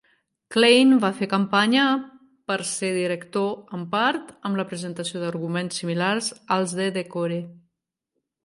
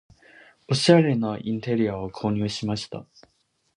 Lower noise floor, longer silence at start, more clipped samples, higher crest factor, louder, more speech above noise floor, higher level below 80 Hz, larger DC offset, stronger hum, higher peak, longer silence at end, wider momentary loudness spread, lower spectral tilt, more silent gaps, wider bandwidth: first, -81 dBFS vs -53 dBFS; second, 0.5 s vs 0.7 s; neither; about the same, 20 dB vs 22 dB; about the same, -23 LUFS vs -23 LUFS; first, 58 dB vs 30 dB; second, -72 dBFS vs -56 dBFS; neither; neither; about the same, -4 dBFS vs -2 dBFS; first, 0.9 s vs 0.75 s; about the same, 12 LU vs 13 LU; second, -4.5 dB/octave vs -6 dB/octave; neither; about the same, 11.5 kHz vs 11 kHz